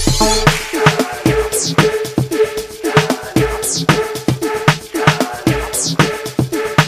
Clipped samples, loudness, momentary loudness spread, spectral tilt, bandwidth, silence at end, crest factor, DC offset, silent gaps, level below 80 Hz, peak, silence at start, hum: under 0.1%; -15 LUFS; 5 LU; -4 dB/octave; 16 kHz; 0 s; 16 dB; under 0.1%; none; -30 dBFS; 0 dBFS; 0 s; none